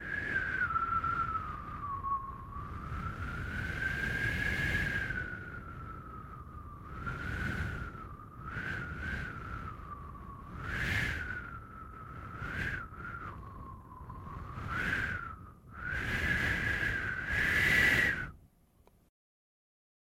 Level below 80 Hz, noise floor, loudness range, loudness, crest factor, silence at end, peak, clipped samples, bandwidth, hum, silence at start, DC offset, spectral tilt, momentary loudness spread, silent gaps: -48 dBFS; -65 dBFS; 11 LU; -34 LUFS; 20 dB; 1.6 s; -16 dBFS; under 0.1%; 16 kHz; none; 0 s; under 0.1%; -4.5 dB/octave; 17 LU; none